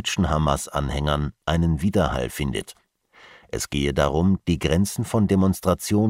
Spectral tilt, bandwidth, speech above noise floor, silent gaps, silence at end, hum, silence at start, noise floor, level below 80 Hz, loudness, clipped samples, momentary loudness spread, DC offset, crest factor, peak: -5.5 dB/octave; 16 kHz; 30 dB; none; 0 s; none; 0 s; -52 dBFS; -34 dBFS; -23 LUFS; under 0.1%; 7 LU; under 0.1%; 18 dB; -4 dBFS